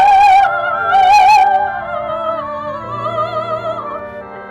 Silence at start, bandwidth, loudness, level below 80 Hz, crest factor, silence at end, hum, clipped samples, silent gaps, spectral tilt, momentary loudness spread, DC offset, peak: 0 s; 12 kHz; -13 LUFS; -46 dBFS; 8 dB; 0 s; none; under 0.1%; none; -3.5 dB/octave; 16 LU; under 0.1%; -4 dBFS